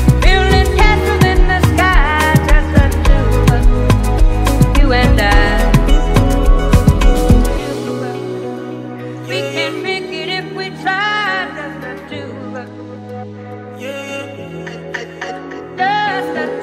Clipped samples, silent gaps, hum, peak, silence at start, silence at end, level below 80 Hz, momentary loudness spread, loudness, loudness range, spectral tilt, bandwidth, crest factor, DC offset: under 0.1%; none; none; 0 dBFS; 0 s; 0 s; -16 dBFS; 16 LU; -14 LUFS; 14 LU; -6 dB/octave; 15.5 kHz; 12 dB; under 0.1%